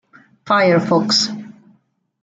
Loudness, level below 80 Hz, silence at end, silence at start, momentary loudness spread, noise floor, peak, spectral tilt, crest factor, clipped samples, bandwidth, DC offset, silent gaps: -15 LUFS; -64 dBFS; 0.7 s; 0.45 s; 8 LU; -59 dBFS; -2 dBFS; -4 dB/octave; 16 dB; under 0.1%; 9.4 kHz; under 0.1%; none